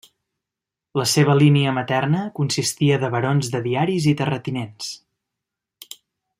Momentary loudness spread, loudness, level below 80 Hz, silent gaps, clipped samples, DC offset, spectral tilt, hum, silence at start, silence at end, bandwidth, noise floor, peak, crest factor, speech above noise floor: 16 LU; -20 LUFS; -60 dBFS; none; under 0.1%; under 0.1%; -5.5 dB/octave; none; 0.95 s; 1.45 s; 16 kHz; -86 dBFS; -2 dBFS; 18 dB; 67 dB